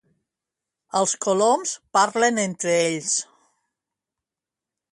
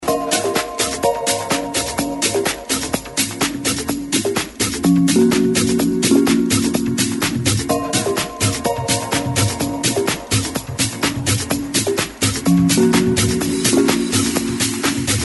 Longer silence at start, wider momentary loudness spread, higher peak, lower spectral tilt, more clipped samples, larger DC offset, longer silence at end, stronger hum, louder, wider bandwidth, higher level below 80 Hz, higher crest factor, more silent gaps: first, 0.95 s vs 0 s; about the same, 5 LU vs 6 LU; second, -6 dBFS vs -2 dBFS; second, -2.5 dB/octave vs -4 dB/octave; neither; neither; first, 1.7 s vs 0 s; neither; second, -21 LUFS vs -17 LUFS; about the same, 11.5 kHz vs 12 kHz; second, -72 dBFS vs -42 dBFS; about the same, 20 dB vs 16 dB; neither